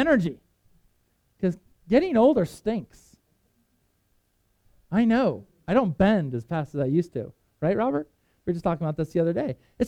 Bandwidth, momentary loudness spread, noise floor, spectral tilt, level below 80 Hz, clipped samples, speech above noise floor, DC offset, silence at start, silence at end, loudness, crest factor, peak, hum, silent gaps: 12.5 kHz; 13 LU; -69 dBFS; -8 dB/octave; -52 dBFS; under 0.1%; 46 dB; under 0.1%; 0 s; 0 s; -25 LUFS; 20 dB; -6 dBFS; none; none